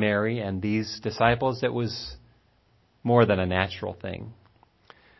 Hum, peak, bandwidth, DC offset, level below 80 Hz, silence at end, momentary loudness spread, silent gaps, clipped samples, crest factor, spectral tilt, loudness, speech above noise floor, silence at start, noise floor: none; -6 dBFS; 6.2 kHz; under 0.1%; -48 dBFS; 0.85 s; 15 LU; none; under 0.1%; 22 dB; -6.5 dB/octave; -26 LUFS; 39 dB; 0 s; -64 dBFS